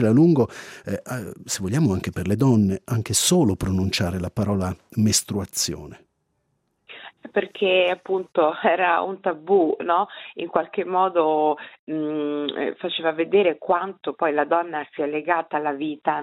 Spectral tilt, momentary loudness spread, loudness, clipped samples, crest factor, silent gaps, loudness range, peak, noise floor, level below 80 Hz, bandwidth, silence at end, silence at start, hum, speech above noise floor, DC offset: -5 dB/octave; 11 LU; -22 LUFS; under 0.1%; 20 dB; 11.79-11.87 s; 3 LU; -4 dBFS; -72 dBFS; -54 dBFS; 15.5 kHz; 0 s; 0 s; none; 50 dB; under 0.1%